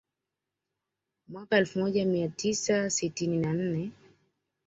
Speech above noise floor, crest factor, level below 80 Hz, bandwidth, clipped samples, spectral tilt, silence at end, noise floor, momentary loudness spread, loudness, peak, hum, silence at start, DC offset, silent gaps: 59 dB; 20 dB; -68 dBFS; 8.2 kHz; under 0.1%; -4.5 dB/octave; 0.75 s; -87 dBFS; 10 LU; -29 LUFS; -12 dBFS; none; 1.3 s; under 0.1%; none